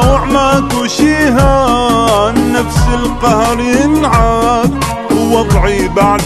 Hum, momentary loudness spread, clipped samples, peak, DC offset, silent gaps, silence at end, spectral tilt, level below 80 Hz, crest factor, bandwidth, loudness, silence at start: none; 4 LU; under 0.1%; 0 dBFS; under 0.1%; none; 0 s; -5.5 dB/octave; -20 dBFS; 10 dB; 14 kHz; -11 LUFS; 0 s